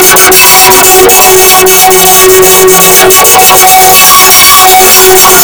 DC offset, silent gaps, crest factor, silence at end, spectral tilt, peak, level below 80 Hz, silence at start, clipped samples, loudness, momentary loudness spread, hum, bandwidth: 3%; none; 2 dB; 0 s; -1 dB/octave; 0 dBFS; -30 dBFS; 0 s; 70%; 1 LUFS; 2 LU; none; over 20 kHz